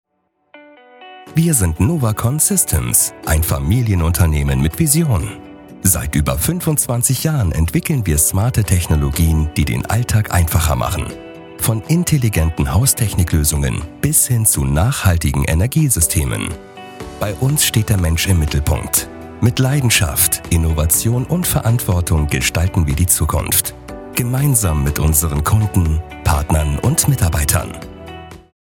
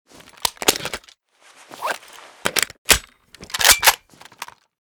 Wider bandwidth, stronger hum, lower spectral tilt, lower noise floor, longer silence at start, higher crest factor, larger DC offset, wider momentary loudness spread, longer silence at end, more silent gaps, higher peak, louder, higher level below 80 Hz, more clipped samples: second, 18 kHz vs over 20 kHz; neither; first, -4.5 dB/octave vs 0 dB/octave; first, -66 dBFS vs -52 dBFS; first, 0.55 s vs 0.4 s; second, 16 dB vs 22 dB; neither; second, 8 LU vs 23 LU; about the same, 0.35 s vs 0.35 s; second, none vs 2.78-2.85 s; about the same, 0 dBFS vs 0 dBFS; first, -15 LUFS vs -18 LUFS; first, -28 dBFS vs -44 dBFS; neither